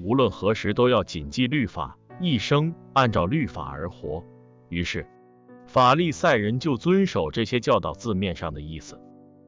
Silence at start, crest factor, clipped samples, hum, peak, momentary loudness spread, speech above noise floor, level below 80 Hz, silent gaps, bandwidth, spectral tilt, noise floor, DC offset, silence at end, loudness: 0 s; 16 dB; under 0.1%; none; -10 dBFS; 14 LU; 27 dB; -46 dBFS; none; 7.6 kHz; -6 dB/octave; -50 dBFS; under 0.1%; 0.5 s; -24 LUFS